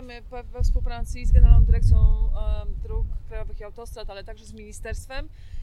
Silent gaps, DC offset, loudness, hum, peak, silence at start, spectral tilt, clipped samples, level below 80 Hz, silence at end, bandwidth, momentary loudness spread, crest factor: none; under 0.1%; -24 LUFS; none; -2 dBFS; 0 s; -7 dB/octave; under 0.1%; -22 dBFS; 0 s; 10.5 kHz; 21 LU; 18 dB